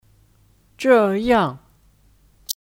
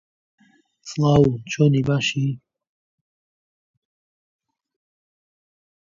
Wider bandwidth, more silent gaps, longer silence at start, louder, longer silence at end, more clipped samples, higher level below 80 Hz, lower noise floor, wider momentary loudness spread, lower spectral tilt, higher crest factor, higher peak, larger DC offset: first, 17 kHz vs 7.6 kHz; neither; about the same, 0.8 s vs 0.85 s; about the same, -18 LUFS vs -20 LUFS; second, 0.1 s vs 3.45 s; neither; about the same, -50 dBFS vs -52 dBFS; second, -57 dBFS vs under -90 dBFS; about the same, 14 LU vs 12 LU; second, -5 dB/octave vs -6.5 dB/octave; about the same, 18 dB vs 22 dB; about the same, -2 dBFS vs -4 dBFS; neither